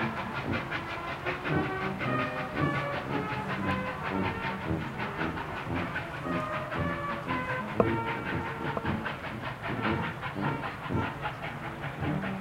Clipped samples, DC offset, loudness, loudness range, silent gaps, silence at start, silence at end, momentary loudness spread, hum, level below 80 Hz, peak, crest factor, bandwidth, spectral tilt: under 0.1%; under 0.1%; -32 LUFS; 2 LU; none; 0 s; 0 s; 5 LU; none; -54 dBFS; -6 dBFS; 26 dB; 16.5 kHz; -7 dB/octave